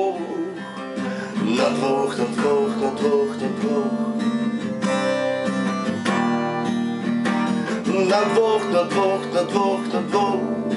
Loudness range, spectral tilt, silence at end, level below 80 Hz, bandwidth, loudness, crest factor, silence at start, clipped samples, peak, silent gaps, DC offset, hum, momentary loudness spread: 2 LU; -5.5 dB/octave; 0 s; -72 dBFS; 11.5 kHz; -22 LUFS; 18 dB; 0 s; under 0.1%; -4 dBFS; none; under 0.1%; none; 6 LU